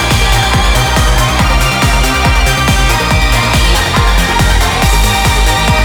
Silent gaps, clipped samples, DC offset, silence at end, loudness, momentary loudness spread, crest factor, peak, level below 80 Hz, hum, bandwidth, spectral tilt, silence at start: none; under 0.1%; under 0.1%; 0 s; -10 LUFS; 1 LU; 8 dB; 0 dBFS; -12 dBFS; none; over 20 kHz; -3.5 dB/octave; 0 s